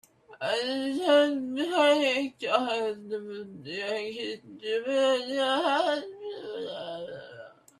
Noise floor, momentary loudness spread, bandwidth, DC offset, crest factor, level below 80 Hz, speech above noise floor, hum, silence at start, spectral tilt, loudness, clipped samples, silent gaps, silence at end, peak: -49 dBFS; 16 LU; 13 kHz; under 0.1%; 20 dB; -78 dBFS; 21 dB; none; 0.3 s; -3.5 dB/octave; -28 LUFS; under 0.1%; none; 0.3 s; -8 dBFS